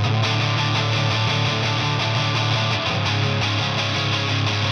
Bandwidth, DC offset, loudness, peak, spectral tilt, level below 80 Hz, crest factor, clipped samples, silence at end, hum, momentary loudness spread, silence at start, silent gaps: 7.6 kHz; under 0.1%; -20 LUFS; -10 dBFS; -4.5 dB/octave; -50 dBFS; 12 dB; under 0.1%; 0 s; none; 1 LU; 0 s; none